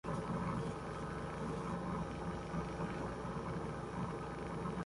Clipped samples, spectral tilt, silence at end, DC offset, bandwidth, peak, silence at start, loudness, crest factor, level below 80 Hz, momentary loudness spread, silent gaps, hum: under 0.1%; -7 dB/octave; 0 s; under 0.1%; 11.5 kHz; -28 dBFS; 0.05 s; -42 LUFS; 14 dB; -54 dBFS; 3 LU; none; none